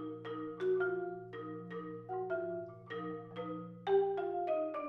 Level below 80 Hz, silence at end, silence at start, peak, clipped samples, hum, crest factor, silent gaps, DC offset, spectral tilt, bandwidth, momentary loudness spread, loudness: -80 dBFS; 0 s; 0 s; -22 dBFS; under 0.1%; none; 16 dB; none; under 0.1%; -8.5 dB/octave; 4.3 kHz; 12 LU; -39 LUFS